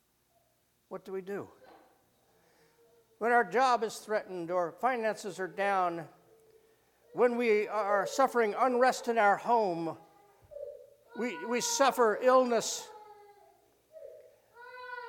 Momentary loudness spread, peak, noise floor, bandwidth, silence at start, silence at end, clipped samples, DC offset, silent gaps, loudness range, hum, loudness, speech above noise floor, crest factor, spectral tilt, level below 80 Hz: 21 LU; -12 dBFS; -73 dBFS; 17.5 kHz; 0.9 s; 0 s; under 0.1%; under 0.1%; none; 5 LU; none; -30 LUFS; 43 dB; 20 dB; -3 dB/octave; -80 dBFS